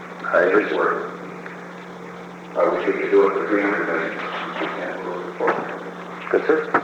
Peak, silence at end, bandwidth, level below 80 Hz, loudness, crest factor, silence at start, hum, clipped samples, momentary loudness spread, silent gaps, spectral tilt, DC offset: -4 dBFS; 0 s; 8.6 kHz; -66 dBFS; -21 LUFS; 18 dB; 0 s; none; under 0.1%; 18 LU; none; -6 dB/octave; under 0.1%